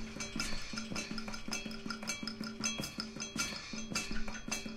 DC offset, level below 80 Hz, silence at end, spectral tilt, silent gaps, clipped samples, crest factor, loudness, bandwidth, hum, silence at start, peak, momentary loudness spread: under 0.1%; -50 dBFS; 0 s; -2 dB/octave; none; under 0.1%; 20 dB; -39 LUFS; 16 kHz; none; 0 s; -20 dBFS; 5 LU